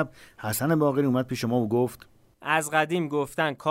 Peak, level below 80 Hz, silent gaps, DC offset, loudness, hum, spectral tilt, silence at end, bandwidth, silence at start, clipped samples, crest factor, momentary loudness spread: -8 dBFS; -62 dBFS; none; under 0.1%; -26 LUFS; none; -5.5 dB/octave; 0 s; 16 kHz; 0 s; under 0.1%; 18 dB; 8 LU